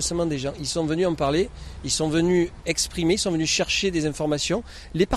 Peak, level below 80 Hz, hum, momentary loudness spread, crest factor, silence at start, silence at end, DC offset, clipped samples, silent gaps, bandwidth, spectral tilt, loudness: -6 dBFS; -42 dBFS; none; 6 LU; 18 dB; 0 s; 0 s; under 0.1%; under 0.1%; none; 13.5 kHz; -4 dB/octave; -24 LUFS